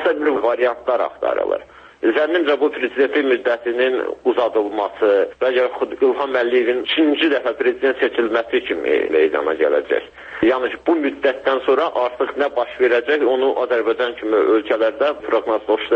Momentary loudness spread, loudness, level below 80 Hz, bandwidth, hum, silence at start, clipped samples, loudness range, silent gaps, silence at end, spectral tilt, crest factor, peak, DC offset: 4 LU; -18 LUFS; -58 dBFS; 6.4 kHz; none; 0 s; under 0.1%; 1 LU; none; 0 s; -5 dB/octave; 14 dB; -4 dBFS; under 0.1%